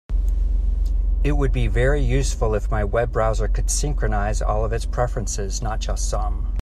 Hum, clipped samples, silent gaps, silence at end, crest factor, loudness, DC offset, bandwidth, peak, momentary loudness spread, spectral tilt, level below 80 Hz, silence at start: none; under 0.1%; none; 0 s; 14 dB; -23 LUFS; under 0.1%; 12.5 kHz; -6 dBFS; 5 LU; -5 dB/octave; -22 dBFS; 0.1 s